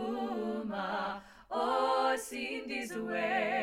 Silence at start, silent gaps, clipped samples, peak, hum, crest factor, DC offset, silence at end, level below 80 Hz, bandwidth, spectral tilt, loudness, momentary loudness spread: 0 s; none; under 0.1%; -18 dBFS; none; 16 dB; under 0.1%; 0 s; -68 dBFS; 16.5 kHz; -4 dB/octave; -34 LUFS; 8 LU